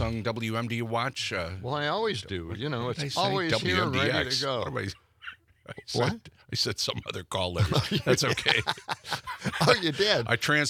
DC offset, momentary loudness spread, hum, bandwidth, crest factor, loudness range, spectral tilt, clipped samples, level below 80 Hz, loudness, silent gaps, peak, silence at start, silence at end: under 0.1%; 11 LU; none; 16.5 kHz; 24 dB; 5 LU; -4 dB/octave; under 0.1%; -54 dBFS; -28 LUFS; none; -4 dBFS; 0 s; 0 s